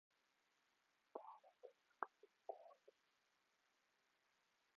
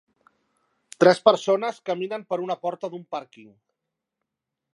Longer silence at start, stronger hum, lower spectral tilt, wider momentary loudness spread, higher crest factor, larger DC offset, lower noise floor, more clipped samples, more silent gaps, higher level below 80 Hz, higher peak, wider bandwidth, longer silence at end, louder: first, 1.15 s vs 1 s; neither; second, 0 dB/octave vs -5 dB/octave; second, 13 LU vs 17 LU; first, 36 dB vs 24 dB; neither; about the same, -85 dBFS vs -84 dBFS; neither; neither; second, under -90 dBFS vs -78 dBFS; second, -26 dBFS vs -2 dBFS; second, 7 kHz vs 11.5 kHz; first, 1.85 s vs 1.35 s; second, -59 LUFS vs -23 LUFS